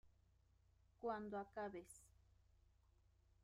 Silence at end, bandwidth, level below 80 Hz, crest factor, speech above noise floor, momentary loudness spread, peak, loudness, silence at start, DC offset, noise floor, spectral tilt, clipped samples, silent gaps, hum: 1.35 s; 15 kHz; -76 dBFS; 20 dB; 26 dB; 15 LU; -34 dBFS; -50 LUFS; 0.05 s; under 0.1%; -76 dBFS; -5.5 dB/octave; under 0.1%; none; none